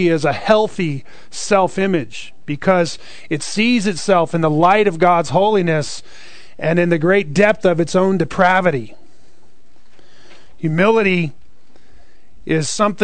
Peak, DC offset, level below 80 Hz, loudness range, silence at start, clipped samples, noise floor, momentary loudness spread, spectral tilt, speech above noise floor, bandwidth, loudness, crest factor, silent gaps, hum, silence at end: 0 dBFS; 3%; -50 dBFS; 5 LU; 0 s; under 0.1%; -55 dBFS; 13 LU; -5.5 dB/octave; 39 dB; 9.4 kHz; -16 LUFS; 16 dB; none; none; 0 s